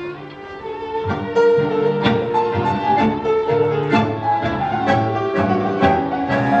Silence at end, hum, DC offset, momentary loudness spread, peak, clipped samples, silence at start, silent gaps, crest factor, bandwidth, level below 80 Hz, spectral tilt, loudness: 0 s; none; under 0.1%; 9 LU; -2 dBFS; under 0.1%; 0 s; none; 16 dB; 7.8 kHz; -48 dBFS; -7.5 dB/octave; -18 LUFS